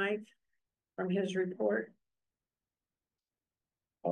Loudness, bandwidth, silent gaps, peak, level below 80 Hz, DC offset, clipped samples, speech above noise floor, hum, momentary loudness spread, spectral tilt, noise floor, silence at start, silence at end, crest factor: -35 LUFS; 9.8 kHz; none; -20 dBFS; -88 dBFS; under 0.1%; under 0.1%; over 56 dB; none; 12 LU; -6.5 dB/octave; under -90 dBFS; 0 s; 0 s; 18 dB